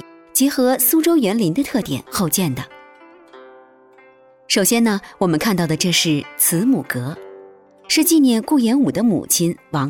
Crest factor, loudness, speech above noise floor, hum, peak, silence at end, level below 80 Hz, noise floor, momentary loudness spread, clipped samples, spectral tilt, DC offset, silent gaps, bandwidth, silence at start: 14 dB; -17 LUFS; 32 dB; none; -4 dBFS; 0 s; -54 dBFS; -49 dBFS; 9 LU; under 0.1%; -4 dB/octave; under 0.1%; none; 19 kHz; 0.35 s